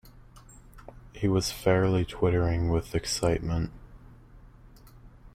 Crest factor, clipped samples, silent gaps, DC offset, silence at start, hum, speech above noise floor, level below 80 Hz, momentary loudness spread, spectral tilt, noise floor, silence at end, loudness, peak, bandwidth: 18 dB; under 0.1%; none; under 0.1%; 0.05 s; none; 25 dB; -44 dBFS; 7 LU; -5.5 dB/octave; -51 dBFS; 0.05 s; -27 LUFS; -10 dBFS; 16 kHz